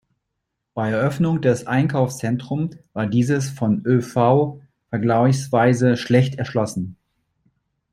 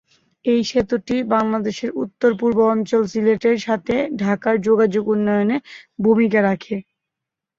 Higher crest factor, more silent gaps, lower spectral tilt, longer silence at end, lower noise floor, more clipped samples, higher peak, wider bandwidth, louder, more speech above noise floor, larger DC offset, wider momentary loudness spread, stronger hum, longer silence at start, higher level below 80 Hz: about the same, 18 dB vs 16 dB; neither; about the same, -7 dB/octave vs -6.5 dB/octave; first, 1 s vs 0.75 s; second, -78 dBFS vs -84 dBFS; neither; about the same, -2 dBFS vs -4 dBFS; first, 14 kHz vs 7.6 kHz; about the same, -20 LUFS vs -19 LUFS; second, 59 dB vs 66 dB; neither; about the same, 10 LU vs 9 LU; neither; first, 0.75 s vs 0.45 s; about the same, -56 dBFS vs -54 dBFS